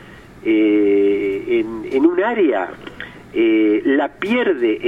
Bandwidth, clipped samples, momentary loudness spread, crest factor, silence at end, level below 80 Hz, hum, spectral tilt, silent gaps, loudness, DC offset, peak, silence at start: 5 kHz; under 0.1%; 12 LU; 16 dB; 0 s; -52 dBFS; none; -7 dB/octave; none; -17 LUFS; under 0.1%; -2 dBFS; 0 s